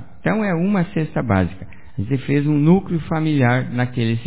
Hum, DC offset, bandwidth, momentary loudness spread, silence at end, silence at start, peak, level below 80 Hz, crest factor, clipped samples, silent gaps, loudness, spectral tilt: none; 2%; 4 kHz; 8 LU; 0 s; 0 s; -2 dBFS; -42 dBFS; 16 dB; under 0.1%; none; -19 LUFS; -12 dB/octave